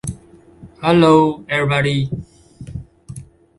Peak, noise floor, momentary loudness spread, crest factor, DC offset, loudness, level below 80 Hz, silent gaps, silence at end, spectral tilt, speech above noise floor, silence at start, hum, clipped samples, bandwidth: 0 dBFS; -44 dBFS; 25 LU; 18 dB; under 0.1%; -15 LUFS; -44 dBFS; none; 0.35 s; -6.5 dB/octave; 29 dB; 0.05 s; none; under 0.1%; 11.5 kHz